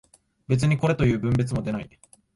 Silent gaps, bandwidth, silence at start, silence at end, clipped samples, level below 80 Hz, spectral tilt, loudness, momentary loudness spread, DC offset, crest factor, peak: none; 11.5 kHz; 0.5 s; 0.5 s; under 0.1%; -46 dBFS; -7.5 dB/octave; -24 LUFS; 11 LU; under 0.1%; 16 dB; -10 dBFS